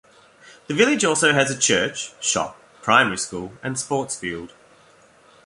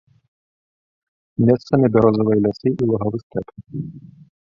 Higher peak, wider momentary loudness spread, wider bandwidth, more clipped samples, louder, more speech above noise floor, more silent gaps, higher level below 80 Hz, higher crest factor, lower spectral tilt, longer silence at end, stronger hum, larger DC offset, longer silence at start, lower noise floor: about the same, -2 dBFS vs -2 dBFS; second, 13 LU vs 16 LU; first, 11.5 kHz vs 6.8 kHz; neither; about the same, -20 LUFS vs -18 LUFS; second, 32 dB vs over 72 dB; second, none vs 3.23-3.30 s; second, -58 dBFS vs -52 dBFS; about the same, 22 dB vs 18 dB; second, -2.5 dB/octave vs -10 dB/octave; first, 1 s vs 0.5 s; neither; neither; second, 0.45 s vs 1.4 s; second, -53 dBFS vs under -90 dBFS